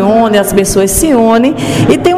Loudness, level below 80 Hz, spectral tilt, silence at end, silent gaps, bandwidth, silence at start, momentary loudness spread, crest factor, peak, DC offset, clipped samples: -9 LUFS; -28 dBFS; -5 dB/octave; 0 s; none; 16.5 kHz; 0 s; 3 LU; 8 dB; 0 dBFS; under 0.1%; 0.5%